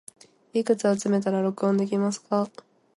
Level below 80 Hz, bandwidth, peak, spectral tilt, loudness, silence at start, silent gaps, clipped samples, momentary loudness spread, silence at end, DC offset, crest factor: -72 dBFS; 11.5 kHz; -8 dBFS; -6.5 dB/octave; -25 LUFS; 0.55 s; none; under 0.1%; 5 LU; 0.5 s; under 0.1%; 16 dB